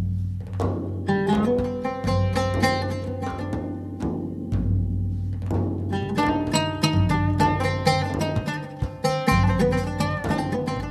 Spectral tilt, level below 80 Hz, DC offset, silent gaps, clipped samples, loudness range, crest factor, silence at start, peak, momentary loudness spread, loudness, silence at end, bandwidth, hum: -6.5 dB/octave; -36 dBFS; under 0.1%; none; under 0.1%; 4 LU; 18 dB; 0 s; -6 dBFS; 9 LU; -24 LUFS; 0 s; 14 kHz; none